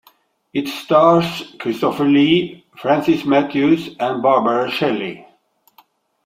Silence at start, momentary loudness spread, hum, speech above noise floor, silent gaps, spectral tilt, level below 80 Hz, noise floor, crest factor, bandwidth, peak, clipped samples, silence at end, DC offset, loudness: 0.55 s; 12 LU; none; 41 dB; none; -6.5 dB/octave; -60 dBFS; -57 dBFS; 16 dB; 16 kHz; 0 dBFS; under 0.1%; 1.05 s; under 0.1%; -17 LUFS